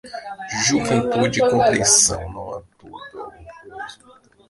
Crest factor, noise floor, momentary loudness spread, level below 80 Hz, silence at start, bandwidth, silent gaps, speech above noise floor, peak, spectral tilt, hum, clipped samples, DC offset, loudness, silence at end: 20 dB; -51 dBFS; 24 LU; -46 dBFS; 0.05 s; 11.5 kHz; none; 34 dB; -2 dBFS; -2.5 dB/octave; none; under 0.1%; under 0.1%; -17 LUFS; 0.55 s